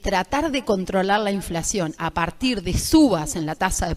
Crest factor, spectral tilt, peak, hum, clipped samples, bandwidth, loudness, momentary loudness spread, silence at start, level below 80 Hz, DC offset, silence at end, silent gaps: 18 dB; -4.5 dB/octave; -4 dBFS; none; under 0.1%; 15.5 kHz; -22 LUFS; 8 LU; 0 s; -36 dBFS; under 0.1%; 0 s; none